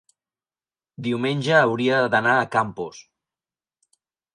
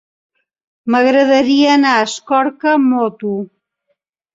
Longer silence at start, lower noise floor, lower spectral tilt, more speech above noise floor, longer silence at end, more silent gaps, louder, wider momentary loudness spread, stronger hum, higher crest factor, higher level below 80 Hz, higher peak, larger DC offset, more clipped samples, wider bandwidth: first, 1 s vs 0.85 s; first, under -90 dBFS vs -69 dBFS; first, -5.5 dB/octave vs -4 dB/octave; first, over 69 dB vs 56 dB; first, 1.35 s vs 0.9 s; neither; second, -21 LUFS vs -13 LUFS; about the same, 13 LU vs 12 LU; neither; first, 20 dB vs 14 dB; about the same, -66 dBFS vs -62 dBFS; about the same, -4 dBFS vs -2 dBFS; neither; neither; first, 11 kHz vs 7.8 kHz